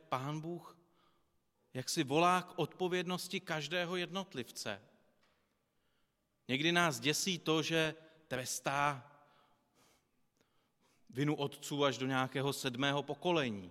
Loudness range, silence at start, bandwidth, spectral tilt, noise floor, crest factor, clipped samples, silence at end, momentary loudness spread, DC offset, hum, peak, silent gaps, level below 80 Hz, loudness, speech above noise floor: 7 LU; 0.1 s; 16 kHz; -4 dB/octave; -80 dBFS; 22 dB; under 0.1%; 0 s; 12 LU; under 0.1%; none; -16 dBFS; none; -76 dBFS; -36 LUFS; 44 dB